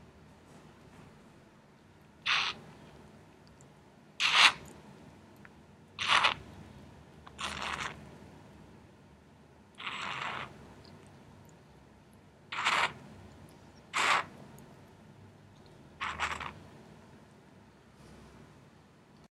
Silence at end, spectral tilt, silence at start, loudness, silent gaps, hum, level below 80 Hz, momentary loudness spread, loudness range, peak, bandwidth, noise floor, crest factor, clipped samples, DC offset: 0.9 s; -1 dB/octave; 0.55 s; -30 LUFS; none; none; -66 dBFS; 29 LU; 14 LU; -6 dBFS; 16 kHz; -59 dBFS; 32 dB; under 0.1%; under 0.1%